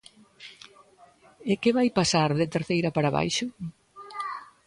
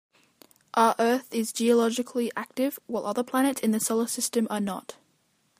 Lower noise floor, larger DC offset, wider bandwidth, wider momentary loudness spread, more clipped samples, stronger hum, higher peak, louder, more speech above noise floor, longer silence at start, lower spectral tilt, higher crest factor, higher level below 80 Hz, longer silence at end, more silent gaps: second, -56 dBFS vs -69 dBFS; neither; second, 11.5 kHz vs 15.5 kHz; first, 20 LU vs 8 LU; neither; neither; about the same, -10 dBFS vs -8 dBFS; about the same, -26 LUFS vs -26 LUFS; second, 31 dB vs 43 dB; second, 0.4 s vs 0.75 s; first, -5 dB/octave vs -3.5 dB/octave; about the same, 18 dB vs 20 dB; first, -60 dBFS vs -76 dBFS; second, 0.2 s vs 0.65 s; neither